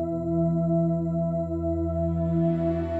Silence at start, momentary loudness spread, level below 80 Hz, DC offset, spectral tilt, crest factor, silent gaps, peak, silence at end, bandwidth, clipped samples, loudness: 0 s; 4 LU; -42 dBFS; under 0.1%; -11.5 dB/octave; 12 dB; none; -14 dBFS; 0 s; 3.4 kHz; under 0.1%; -26 LUFS